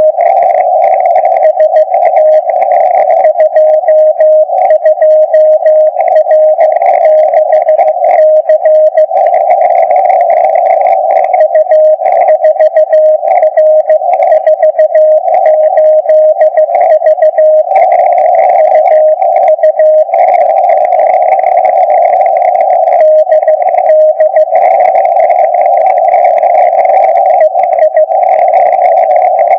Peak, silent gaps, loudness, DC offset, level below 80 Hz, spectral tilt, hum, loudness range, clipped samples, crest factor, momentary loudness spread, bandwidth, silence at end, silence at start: 0 dBFS; none; -6 LUFS; under 0.1%; -76 dBFS; -4 dB/octave; none; 1 LU; 2%; 6 dB; 2 LU; 3.4 kHz; 0 s; 0 s